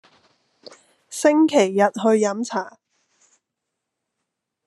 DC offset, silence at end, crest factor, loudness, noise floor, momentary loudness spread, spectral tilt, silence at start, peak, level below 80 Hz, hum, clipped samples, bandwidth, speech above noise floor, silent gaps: under 0.1%; 1.95 s; 18 dB; -19 LUFS; -81 dBFS; 14 LU; -4.5 dB/octave; 1.1 s; -4 dBFS; -78 dBFS; none; under 0.1%; 13 kHz; 63 dB; none